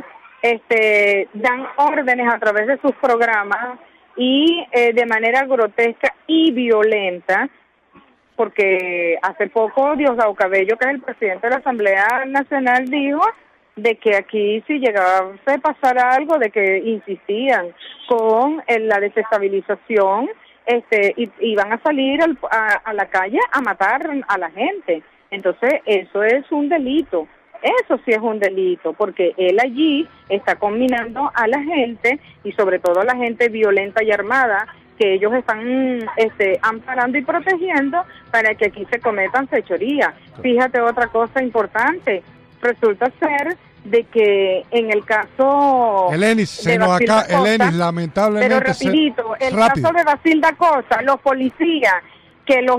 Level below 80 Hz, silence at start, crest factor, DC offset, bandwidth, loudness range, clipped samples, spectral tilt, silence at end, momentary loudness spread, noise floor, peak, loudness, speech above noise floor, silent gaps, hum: -58 dBFS; 0 s; 12 dB; under 0.1%; 15 kHz; 3 LU; under 0.1%; -5.5 dB/octave; 0 s; 7 LU; -51 dBFS; -4 dBFS; -17 LUFS; 34 dB; none; none